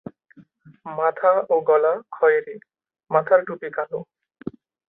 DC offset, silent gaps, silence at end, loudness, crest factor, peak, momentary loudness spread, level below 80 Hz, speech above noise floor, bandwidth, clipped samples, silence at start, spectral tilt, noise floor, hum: under 0.1%; none; 0.4 s; -21 LUFS; 20 dB; -4 dBFS; 19 LU; -70 dBFS; 30 dB; 3.9 kHz; under 0.1%; 0.85 s; -10 dB/octave; -50 dBFS; none